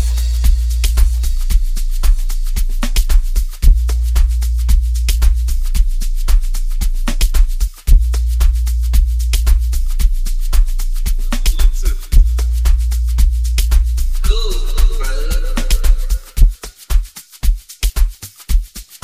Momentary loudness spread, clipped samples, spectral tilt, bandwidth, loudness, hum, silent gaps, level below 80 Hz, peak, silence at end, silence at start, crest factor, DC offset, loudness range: 6 LU; under 0.1%; -4.5 dB/octave; 16 kHz; -18 LUFS; none; none; -12 dBFS; 0 dBFS; 0.1 s; 0 s; 12 dB; under 0.1%; 3 LU